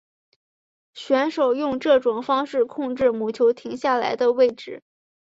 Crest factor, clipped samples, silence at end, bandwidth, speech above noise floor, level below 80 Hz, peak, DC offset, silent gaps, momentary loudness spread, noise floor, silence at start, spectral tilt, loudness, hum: 16 dB; under 0.1%; 0.45 s; 7.8 kHz; over 69 dB; -62 dBFS; -6 dBFS; under 0.1%; none; 7 LU; under -90 dBFS; 0.95 s; -5 dB/octave; -21 LUFS; none